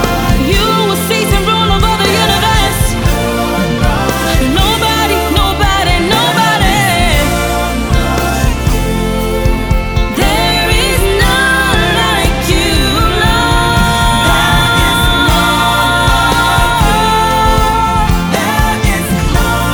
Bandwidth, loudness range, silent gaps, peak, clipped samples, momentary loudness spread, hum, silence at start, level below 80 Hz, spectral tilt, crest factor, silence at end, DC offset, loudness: over 20 kHz; 3 LU; none; 0 dBFS; under 0.1%; 4 LU; none; 0 s; -16 dBFS; -4 dB/octave; 10 dB; 0 s; under 0.1%; -11 LUFS